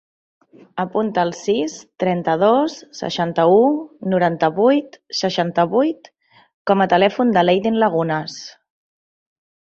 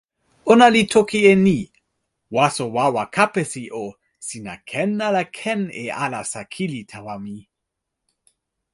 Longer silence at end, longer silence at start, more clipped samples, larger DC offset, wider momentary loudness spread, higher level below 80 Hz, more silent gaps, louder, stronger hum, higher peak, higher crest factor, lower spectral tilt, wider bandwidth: about the same, 1.25 s vs 1.35 s; first, 0.75 s vs 0.45 s; neither; neither; second, 12 LU vs 20 LU; about the same, -62 dBFS vs -58 dBFS; first, 6.54-6.65 s vs none; about the same, -18 LUFS vs -19 LUFS; neither; about the same, -2 dBFS vs 0 dBFS; about the same, 16 dB vs 20 dB; about the same, -6 dB/octave vs -5 dB/octave; second, 8 kHz vs 11.5 kHz